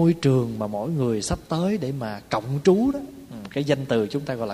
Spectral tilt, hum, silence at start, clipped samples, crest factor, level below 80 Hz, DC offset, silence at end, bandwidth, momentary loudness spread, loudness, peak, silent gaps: -6.5 dB/octave; none; 0 s; under 0.1%; 18 dB; -48 dBFS; under 0.1%; 0 s; 15.5 kHz; 12 LU; -24 LUFS; -6 dBFS; none